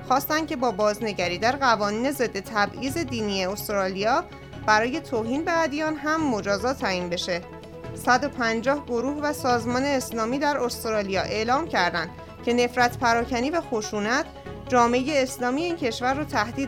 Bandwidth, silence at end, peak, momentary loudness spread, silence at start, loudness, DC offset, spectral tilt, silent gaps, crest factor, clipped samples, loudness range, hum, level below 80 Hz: 19 kHz; 0 s; -4 dBFS; 6 LU; 0 s; -24 LUFS; under 0.1%; -4 dB/octave; none; 20 dB; under 0.1%; 1 LU; none; -48 dBFS